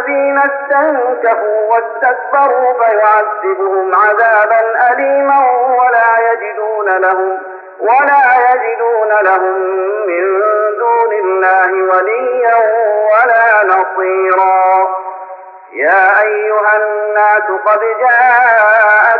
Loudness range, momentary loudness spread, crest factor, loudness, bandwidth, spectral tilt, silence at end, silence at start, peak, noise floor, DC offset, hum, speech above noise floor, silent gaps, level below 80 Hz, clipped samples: 2 LU; 7 LU; 10 dB; -10 LUFS; 4.9 kHz; -5 dB/octave; 0 s; 0 s; 0 dBFS; -31 dBFS; under 0.1%; none; 21 dB; none; -74 dBFS; under 0.1%